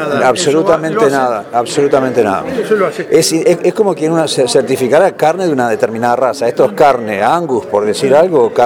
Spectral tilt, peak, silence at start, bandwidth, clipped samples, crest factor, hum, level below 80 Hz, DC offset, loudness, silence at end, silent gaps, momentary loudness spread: -4.5 dB/octave; 0 dBFS; 0 s; 17.5 kHz; 0.3%; 12 dB; none; -52 dBFS; under 0.1%; -12 LUFS; 0 s; none; 5 LU